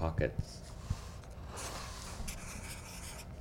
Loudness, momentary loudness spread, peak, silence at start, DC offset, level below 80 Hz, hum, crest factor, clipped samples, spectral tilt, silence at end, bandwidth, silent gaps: -43 LUFS; 10 LU; -18 dBFS; 0 s; under 0.1%; -46 dBFS; none; 22 dB; under 0.1%; -4.5 dB/octave; 0 s; 17 kHz; none